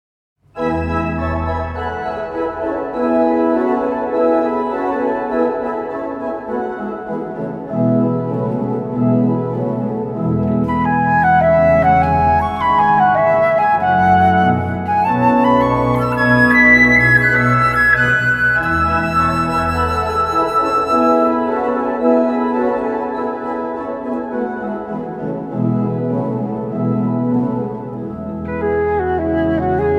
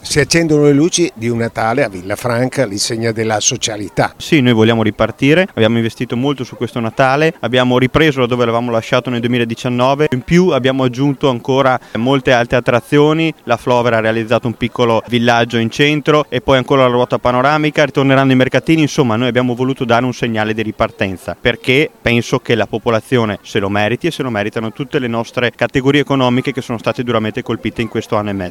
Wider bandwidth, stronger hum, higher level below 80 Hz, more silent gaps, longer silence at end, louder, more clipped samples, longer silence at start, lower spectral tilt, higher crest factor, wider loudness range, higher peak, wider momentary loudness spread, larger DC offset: second, 12.5 kHz vs 16 kHz; neither; first, -36 dBFS vs -42 dBFS; neither; about the same, 0 s vs 0 s; about the same, -16 LUFS vs -14 LUFS; neither; first, 0.55 s vs 0.05 s; first, -7.5 dB/octave vs -5 dB/octave; about the same, 16 dB vs 14 dB; first, 9 LU vs 4 LU; about the same, 0 dBFS vs 0 dBFS; first, 11 LU vs 7 LU; neither